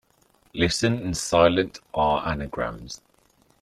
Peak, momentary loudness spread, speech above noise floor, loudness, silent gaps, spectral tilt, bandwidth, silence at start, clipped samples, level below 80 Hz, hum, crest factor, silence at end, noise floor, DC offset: -4 dBFS; 19 LU; 39 dB; -24 LUFS; none; -4.5 dB/octave; 14 kHz; 0.55 s; under 0.1%; -46 dBFS; none; 20 dB; 0.65 s; -62 dBFS; under 0.1%